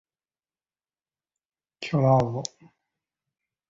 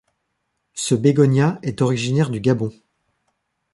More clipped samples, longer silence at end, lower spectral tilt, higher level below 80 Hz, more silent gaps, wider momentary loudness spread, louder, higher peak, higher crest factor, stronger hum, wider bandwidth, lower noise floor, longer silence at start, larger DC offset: neither; first, 1.25 s vs 1.05 s; about the same, -6.5 dB/octave vs -6.5 dB/octave; about the same, -60 dBFS vs -56 dBFS; neither; first, 17 LU vs 11 LU; second, -24 LUFS vs -19 LUFS; second, -8 dBFS vs -2 dBFS; about the same, 22 dB vs 18 dB; neither; second, 7.8 kHz vs 11.5 kHz; first, under -90 dBFS vs -74 dBFS; first, 1.8 s vs 0.75 s; neither